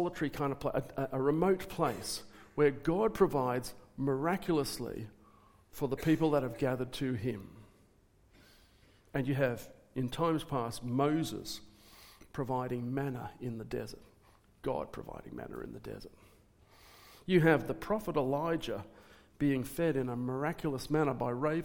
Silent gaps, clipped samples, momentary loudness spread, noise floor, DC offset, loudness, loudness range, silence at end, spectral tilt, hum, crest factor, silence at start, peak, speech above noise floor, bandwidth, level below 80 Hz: none; under 0.1%; 16 LU; -66 dBFS; under 0.1%; -34 LUFS; 8 LU; 0 s; -6.5 dB/octave; none; 22 dB; 0 s; -14 dBFS; 32 dB; 18 kHz; -58 dBFS